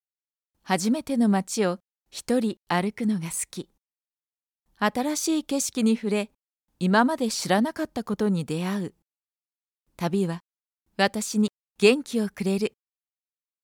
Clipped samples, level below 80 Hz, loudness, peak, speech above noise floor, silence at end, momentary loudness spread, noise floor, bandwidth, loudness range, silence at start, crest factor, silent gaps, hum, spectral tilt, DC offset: under 0.1%; -66 dBFS; -25 LUFS; -6 dBFS; over 65 dB; 0.95 s; 11 LU; under -90 dBFS; 18 kHz; 4 LU; 0.65 s; 20 dB; 4.07-4.11 s; none; -4.5 dB/octave; under 0.1%